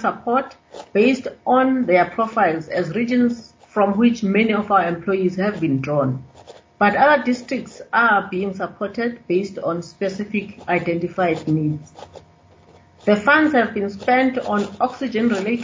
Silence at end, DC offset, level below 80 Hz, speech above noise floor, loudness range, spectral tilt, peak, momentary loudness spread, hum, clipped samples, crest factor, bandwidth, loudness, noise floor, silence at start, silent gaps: 0 s; under 0.1%; -56 dBFS; 31 dB; 4 LU; -6.5 dB/octave; -2 dBFS; 10 LU; none; under 0.1%; 18 dB; 7.6 kHz; -19 LUFS; -50 dBFS; 0 s; none